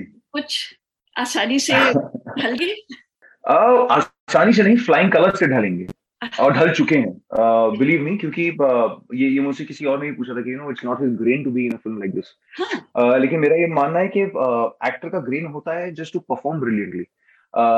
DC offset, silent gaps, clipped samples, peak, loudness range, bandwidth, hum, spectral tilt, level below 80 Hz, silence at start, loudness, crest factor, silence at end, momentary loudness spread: under 0.1%; 4.20-4.27 s; under 0.1%; -2 dBFS; 7 LU; 12.5 kHz; none; -5.5 dB/octave; -64 dBFS; 0 s; -19 LUFS; 18 dB; 0 s; 14 LU